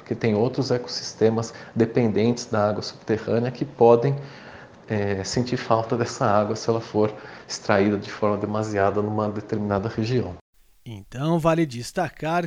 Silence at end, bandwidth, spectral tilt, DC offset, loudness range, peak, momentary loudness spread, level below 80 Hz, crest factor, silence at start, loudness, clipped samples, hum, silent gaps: 0 s; 13 kHz; -6 dB/octave; under 0.1%; 3 LU; -2 dBFS; 10 LU; -56 dBFS; 22 dB; 0 s; -23 LUFS; under 0.1%; none; 10.41-10.53 s